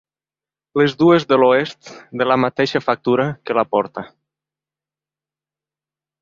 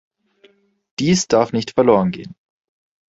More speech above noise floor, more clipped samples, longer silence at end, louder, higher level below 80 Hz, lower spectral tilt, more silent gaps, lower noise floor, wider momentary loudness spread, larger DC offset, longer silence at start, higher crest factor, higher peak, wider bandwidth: first, over 73 dB vs 38 dB; neither; first, 2.15 s vs 0.8 s; about the same, -17 LUFS vs -17 LUFS; second, -60 dBFS vs -52 dBFS; first, -6.5 dB/octave vs -5 dB/octave; neither; first, under -90 dBFS vs -55 dBFS; second, 14 LU vs 18 LU; neither; second, 0.75 s vs 1 s; about the same, 18 dB vs 18 dB; about the same, -2 dBFS vs -2 dBFS; about the same, 7.4 kHz vs 8 kHz